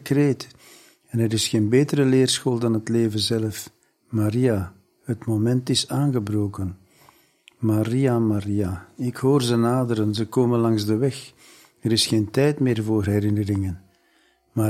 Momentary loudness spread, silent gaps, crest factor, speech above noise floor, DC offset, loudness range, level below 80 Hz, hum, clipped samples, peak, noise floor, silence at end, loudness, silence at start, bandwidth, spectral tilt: 11 LU; none; 16 dB; 41 dB; under 0.1%; 3 LU; -56 dBFS; none; under 0.1%; -6 dBFS; -62 dBFS; 0 s; -22 LUFS; 0 s; 15 kHz; -6 dB/octave